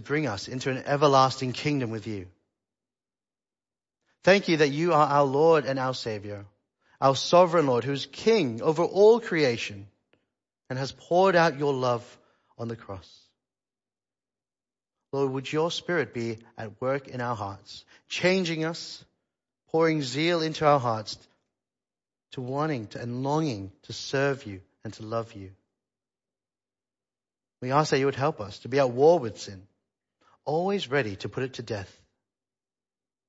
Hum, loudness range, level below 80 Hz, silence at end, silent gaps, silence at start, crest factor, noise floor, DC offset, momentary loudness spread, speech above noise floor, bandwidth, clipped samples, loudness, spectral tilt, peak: none; 10 LU; -68 dBFS; 1.45 s; none; 0 s; 22 dB; under -90 dBFS; under 0.1%; 19 LU; over 64 dB; 8 kHz; under 0.1%; -25 LUFS; -5.5 dB/octave; -6 dBFS